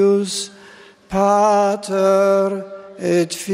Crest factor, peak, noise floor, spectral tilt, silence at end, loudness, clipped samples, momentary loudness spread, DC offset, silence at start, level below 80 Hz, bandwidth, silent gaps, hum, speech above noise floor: 14 dB; -4 dBFS; -44 dBFS; -5 dB/octave; 0 s; -17 LUFS; under 0.1%; 12 LU; under 0.1%; 0 s; -54 dBFS; 16 kHz; none; none; 28 dB